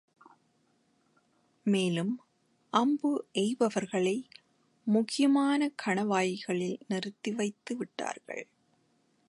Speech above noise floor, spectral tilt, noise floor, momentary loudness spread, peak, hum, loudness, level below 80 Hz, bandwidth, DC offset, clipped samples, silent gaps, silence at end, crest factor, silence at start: 42 dB; -5 dB/octave; -71 dBFS; 11 LU; -12 dBFS; none; -31 LUFS; -82 dBFS; 11.5 kHz; under 0.1%; under 0.1%; none; 0.85 s; 20 dB; 1.65 s